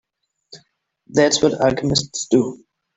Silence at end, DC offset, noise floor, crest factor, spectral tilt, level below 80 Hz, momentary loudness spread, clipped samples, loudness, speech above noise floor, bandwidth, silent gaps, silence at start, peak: 0.4 s; under 0.1%; -63 dBFS; 18 dB; -4 dB/octave; -50 dBFS; 6 LU; under 0.1%; -18 LUFS; 45 dB; 8.4 kHz; none; 0.5 s; -2 dBFS